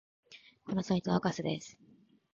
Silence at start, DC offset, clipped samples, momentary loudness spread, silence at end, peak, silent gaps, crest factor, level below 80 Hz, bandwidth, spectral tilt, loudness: 0.3 s; under 0.1%; under 0.1%; 22 LU; 0.6 s; -16 dBFS; none; 20 dB; -66 dBFS; 7.6 kHz; -6 dB/octave; -34 LUFS